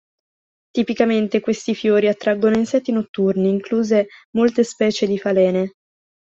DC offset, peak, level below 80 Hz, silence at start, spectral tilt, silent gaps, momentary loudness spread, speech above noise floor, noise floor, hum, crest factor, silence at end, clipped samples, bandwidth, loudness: under 0.1%; -2 dBFS; -60 dBFS; 0.75 s; -6 dB/octave; 3.09-3.14 s, 4.25-4.33 s; 6 LU; over 72 dB; under -90 dBFS; none; 16 dB; 0.65 s; under 0.1%; 7.8 kHz; -19 LUFS